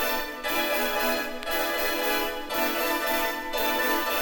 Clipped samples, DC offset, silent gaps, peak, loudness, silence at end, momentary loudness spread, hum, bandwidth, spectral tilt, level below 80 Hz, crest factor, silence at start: under 0.1%; under 0.1%; none; -12 dBFS; -26 LUFS; 0 s; 4 LU; none; 19 kHz; -1 dB/octave; -48 dBFS; 14 dB; 0 s